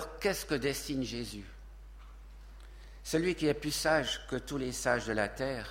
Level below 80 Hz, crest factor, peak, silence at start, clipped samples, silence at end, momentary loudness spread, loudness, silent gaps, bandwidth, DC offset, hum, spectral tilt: -50 dBFS; 22 dB; -14 dBFS; 0 s; under 0.1%; 0 s; 24 LU; -33 LUFS; none; 16.5 kHz; under 0.1%; none; -4 dB/octave